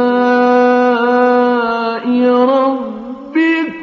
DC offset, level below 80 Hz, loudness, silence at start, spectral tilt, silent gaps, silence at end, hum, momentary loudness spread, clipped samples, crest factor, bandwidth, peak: under 0.1%; -60 dBFS; -12 LUFS; 0 s; -2.5 dB/octave; none; 0 s; none; 8 LU; under 0.1%; 12 dB; 6.4 kHz; 0 dBFS